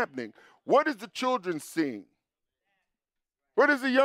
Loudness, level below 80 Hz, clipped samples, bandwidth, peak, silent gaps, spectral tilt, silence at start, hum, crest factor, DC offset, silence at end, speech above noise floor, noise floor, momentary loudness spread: -27 LUFS; -86 dBFS; under 0.1%; 15.5 kHz; -12 dBFS; none; -4 dB/octave; 0 s; none; 18 dB; under 0.1%; 0 s; 61 dB; -88 dBFS; 18 LU